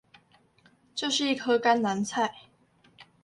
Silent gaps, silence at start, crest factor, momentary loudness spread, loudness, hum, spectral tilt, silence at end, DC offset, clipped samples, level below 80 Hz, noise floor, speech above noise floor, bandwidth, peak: none; 0.95 s; 20 dB; 9 LU; -27 LUFS; none; -3.5 dB/octave; 0.2 s; under 0.1%; under 0.1%; -74 dBFS; -63 dBFS; 37 dB; 11.5 kHz; -10 dBFS